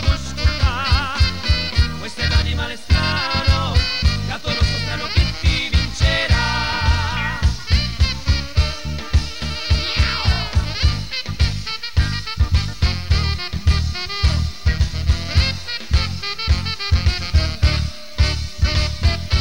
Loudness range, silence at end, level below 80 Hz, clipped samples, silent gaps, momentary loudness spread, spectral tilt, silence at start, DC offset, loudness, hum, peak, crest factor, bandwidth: 2 LU; 0 s; -22 dBFS; under 0.1%; none; 5 LU; -4.5 dB/octave; 0 s; 2%; -20 LUFS; none; -6 dBFS; 12 dB; 15 kHz